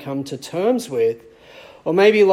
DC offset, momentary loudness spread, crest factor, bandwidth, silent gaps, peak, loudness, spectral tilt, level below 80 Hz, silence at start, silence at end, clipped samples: under 0.1%; 14 LU; 16 dB; 14.5 kHz; none; -4 dBFS; -19 LUFS; -5.5 dB/octave; -64 dBFS; 0 s; 0 s; under 0.1%